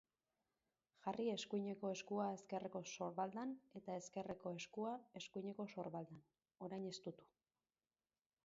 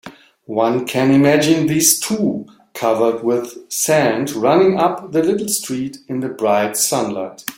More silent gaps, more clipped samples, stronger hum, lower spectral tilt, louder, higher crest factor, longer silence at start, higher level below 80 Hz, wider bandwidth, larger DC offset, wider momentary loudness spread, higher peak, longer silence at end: neither; neither; neither; about the same, -5 dB/octave vs -4 dB/octave; second, -48 LUFS vs -16 LUFS; about the same, 20 dB vs 16 dB; first, 1.05 s vs 0.05 s; second, -86 dBFS vs -58 dBFS; second, 7.4 kHz vs 17 kHz; neither; second, 9 LU vs 12 LU; second, -30 dBFS vs 0 dBFS; first, 1.2 s vs 0.05 s